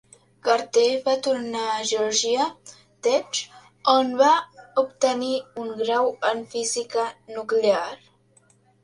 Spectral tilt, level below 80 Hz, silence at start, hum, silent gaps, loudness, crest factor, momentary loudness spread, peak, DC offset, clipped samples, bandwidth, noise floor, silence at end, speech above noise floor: -1.5 dB/octave; -72 dBFS; 0.45 s; none; none; -23 LUFS; 20 dB; 10 LU; -4 dBFS; under 0.1%; under 0.1%; 11.5 kHz; -60 dBFS; 0.85 s; 37 dB